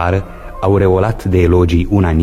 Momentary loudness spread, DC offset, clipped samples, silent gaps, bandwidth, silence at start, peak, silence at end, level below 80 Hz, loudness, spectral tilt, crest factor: 8 LU; under 0.1%; under 0.1%; none; 11 kHz; 0 s; 0 dBFS; 0 s; -24 dBFS; -13 LUFS; -8.5 dB/octave; 12 dB